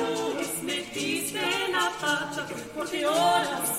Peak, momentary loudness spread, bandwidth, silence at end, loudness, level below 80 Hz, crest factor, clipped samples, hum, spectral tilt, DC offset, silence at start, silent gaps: -12 dBFS; 9 LU; 16.5 kHz; 0 s; -27 LUFS; -64 dBFS; 16 dB; under 0.1%; none; -2 dB/octave; under 0.1%; 0 s; none